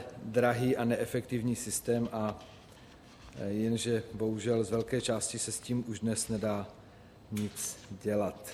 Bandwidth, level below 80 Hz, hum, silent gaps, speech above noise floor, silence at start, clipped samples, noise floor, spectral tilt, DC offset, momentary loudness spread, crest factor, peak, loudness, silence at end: 16.5 kHz; -62 dBFS; none; none; 22 dB; 0 s; under 0.1%; -55 dBFS; -5 dB/octave; under 0.1%; 10 LU; 18 dB; -16 dBFS; -33 LUFS; 0 s